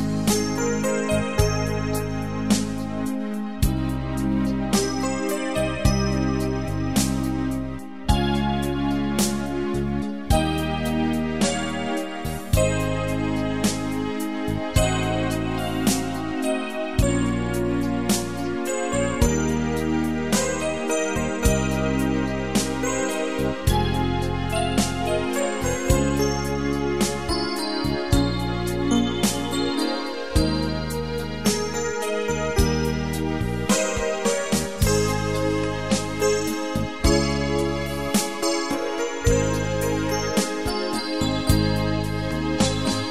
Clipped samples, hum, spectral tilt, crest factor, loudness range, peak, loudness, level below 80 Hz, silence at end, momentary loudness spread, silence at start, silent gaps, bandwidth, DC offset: under 0.1%; none; -5 dB/octave; 20 dB; 1 LU; -4 dBFS; -24 LUFS; -32 dBFS; 0 s; 5 LU; 0 s; none; 16 kHz; 1%